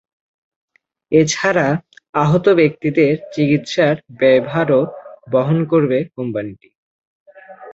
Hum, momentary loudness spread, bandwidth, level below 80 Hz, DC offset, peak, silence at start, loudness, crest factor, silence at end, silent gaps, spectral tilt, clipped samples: none; 10 LU; 8 kHz; -56 dBFS; under 0.1%; -2 dBFS; 1.1 s; -16 LUFS; 16 dB; 0 s; 2.09-2.13 s, 6.75-7.26 s; -6 dB/octave; under 0.1%